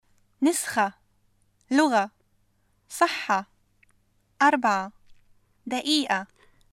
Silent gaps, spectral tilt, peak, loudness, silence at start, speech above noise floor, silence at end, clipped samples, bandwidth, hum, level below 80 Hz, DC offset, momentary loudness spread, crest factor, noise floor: none; -2.5 dB/octave; -6 dBFS; -25 LUFS; 0.4 s; 44 dB; 0.45 s; under 0.1%; 16 kHz; none; -68 dBFS; under 0.1%; 13 LU; 20 dB; -67 dBFS